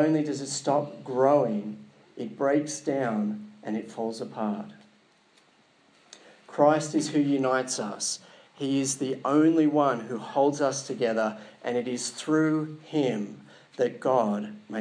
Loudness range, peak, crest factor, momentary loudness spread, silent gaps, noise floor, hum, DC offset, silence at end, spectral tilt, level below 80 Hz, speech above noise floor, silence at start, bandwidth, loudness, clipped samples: 6 LU; -8 dBFS; 20 dB; 13 LU; none; -62 dBFS; none; under 0.1%; 0 s; -5 dB/octave; -88 dBFS; 36 dB; 0 s; 10.5 kHz; -27 LUFS; under 0.1%